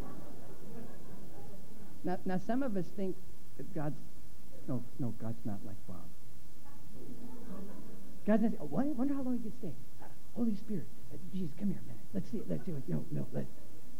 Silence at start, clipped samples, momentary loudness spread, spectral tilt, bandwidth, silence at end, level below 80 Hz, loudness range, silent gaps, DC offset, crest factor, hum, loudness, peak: 0 s; under 0.1%; 20 LU; -8 dB/octave; 17 kHz; 0 s; -62 dBFS; 8 LU; none; 4%; 22 dB; none; -39 LUFS; -18 dBFS